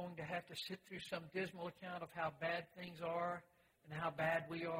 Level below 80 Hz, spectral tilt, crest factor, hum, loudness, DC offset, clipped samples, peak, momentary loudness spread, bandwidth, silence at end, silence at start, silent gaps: -78 dBFS; -5.5 dB/octave; 18 dB; none; -45 LUFS; under 0.1%; under 0.1%; -26 dBFS; 10 LU; 16 kHz; 0 s; 0 s; none